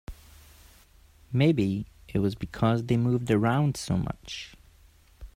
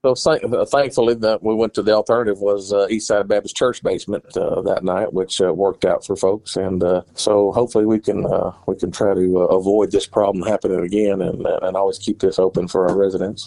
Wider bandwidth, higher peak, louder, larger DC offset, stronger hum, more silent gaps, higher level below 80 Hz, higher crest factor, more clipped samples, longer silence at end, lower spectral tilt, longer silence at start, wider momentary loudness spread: first, 15.5 kHz vs 11.5 kHz; second, -10 dBFS vs -2 dBFS; second, -27 LUFS vs -18 LUFS; neither; neither; neither; about the same, -50 dBFS vs -48 dBFS; about the same, 18 dB vs 16 dB; neither; about the same, 0.1 s vs 0 s; first, -7 dB/octave vs -5.5 dB/octave; about the same, 0.1 s vs 0.05 s; first, 14 LU vs 5 LU